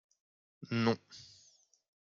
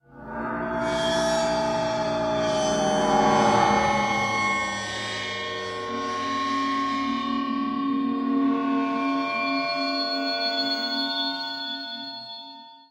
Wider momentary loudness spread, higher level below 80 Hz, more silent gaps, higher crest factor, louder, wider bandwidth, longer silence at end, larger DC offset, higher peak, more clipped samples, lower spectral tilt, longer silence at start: first, 24 LU vs 10 LU; second, -78 dBFS vs -52 dBFS; neither; about the same, 22 dB vs 18 dB; second, -35 LUFS vs -25 LUFS; second, 7.4 kHz vs 16 kHz; first, 0.9 s vs 0.1 s; neither; second, -18 dBFS vs -8 dBFS; neither; first, -6.5 dB/octave vs -4 dB/octave; first, 0.6 s vs 0.1 s